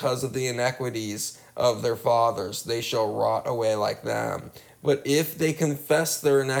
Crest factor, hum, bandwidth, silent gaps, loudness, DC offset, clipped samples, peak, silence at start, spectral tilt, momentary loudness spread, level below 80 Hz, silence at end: 16 dB; none; over 20 kHz; none; -25 LUFS; under 0.1%; under 0.1%; -10 dBFS; 0 s; -4.5 dB/octave; 8 LU; -64 dBFS; 0 s